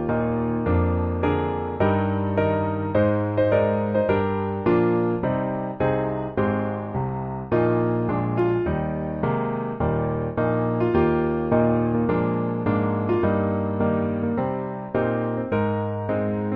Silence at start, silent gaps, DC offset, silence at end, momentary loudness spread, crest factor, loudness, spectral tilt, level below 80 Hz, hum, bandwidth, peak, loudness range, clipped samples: 0 s; none; under 0.1%; 0 s; 5 LU; 16 dB; -23 LUFS; -8 dB/octave; -42 dBFS; none; 4.9 kHz; -8 dBFS; 2 LU; under 0.1%